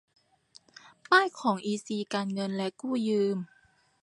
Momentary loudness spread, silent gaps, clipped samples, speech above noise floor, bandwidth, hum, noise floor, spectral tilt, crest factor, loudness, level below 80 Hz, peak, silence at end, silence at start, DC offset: 10 LU; none; under 0.1%; 37 dB; 11.5 kHz; none; -65 dBFS; -5 dB/octave; 22 dB; -29 LUFS; -78 dBFS; -10 dBFS; 0.55 s; 1.1 s; under 0.1%